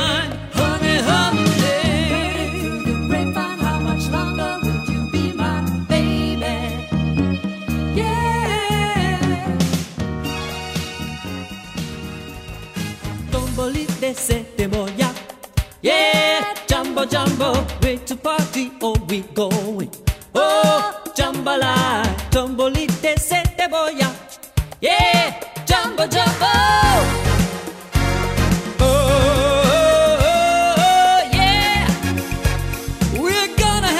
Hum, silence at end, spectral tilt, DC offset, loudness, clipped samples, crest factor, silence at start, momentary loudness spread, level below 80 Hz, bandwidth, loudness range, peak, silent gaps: none; 0 s; -4.5 dB/octave; under 0.1%; -18 LUFS; under 0.1%; 16 dB; 0 s; 12 LU; -30 dBFS; 16 kHz; 8 LU; -4 dBFS; none